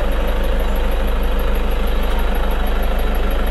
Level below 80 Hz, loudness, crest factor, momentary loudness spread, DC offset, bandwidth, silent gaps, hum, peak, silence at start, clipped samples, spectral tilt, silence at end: -16 dBFS; -21 LUFS; 10 dB; 0 LU; under 0.1%; 12.5 kHz; none; none; -6 dBFS; 0 s; under 0.1%; -6 dB/octave; 0 s